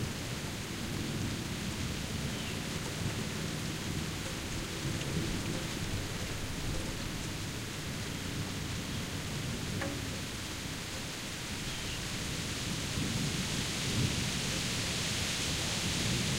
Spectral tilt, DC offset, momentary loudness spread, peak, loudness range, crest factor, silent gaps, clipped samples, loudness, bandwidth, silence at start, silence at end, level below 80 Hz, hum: -3.5 dB/octave; under 0.1%; 6 LU; -18 dBFS; 5 LU; 18 dB; none; under 0.1%; -35 LUFS; 16 kHz; 0 s; 0 s; -48 dBFS; none